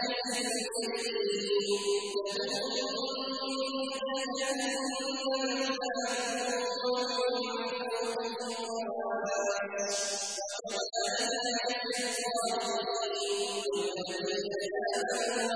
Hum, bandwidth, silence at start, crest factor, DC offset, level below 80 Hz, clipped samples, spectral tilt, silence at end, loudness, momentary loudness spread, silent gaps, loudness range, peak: none; 11 kHz; 0 s; 14 dB; under 0.1%; -76 dBFS; under 0.1%; -1.5 dB/octave; 0 s; -32 LUFS; 4 LU; none; 1 LU; -18 dBFS